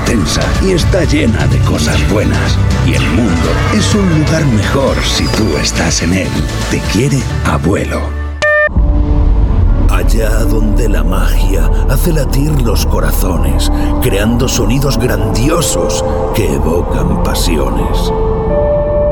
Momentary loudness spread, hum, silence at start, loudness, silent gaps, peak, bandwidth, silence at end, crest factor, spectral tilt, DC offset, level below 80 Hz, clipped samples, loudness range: 3 LU; none; 0 s; -12 LUFS; none; -2 dBFS; 19 kHz; 0 s; 10 dB; -5.5 dB/octave; under 0.1%; -14 dBFS; under 0.1%; 2 LU